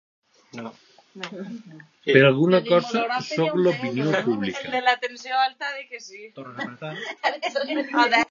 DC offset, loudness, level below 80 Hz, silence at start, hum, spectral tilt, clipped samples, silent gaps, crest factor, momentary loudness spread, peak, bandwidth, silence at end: under 0.1%; -22 LUFS; -70 dBFS; 0.55 s; none; -5.5 dB/octave; under 0.1%; none; 22 dB; 20 LU; -2 dBFS; 7.4 kHz; 0.05 s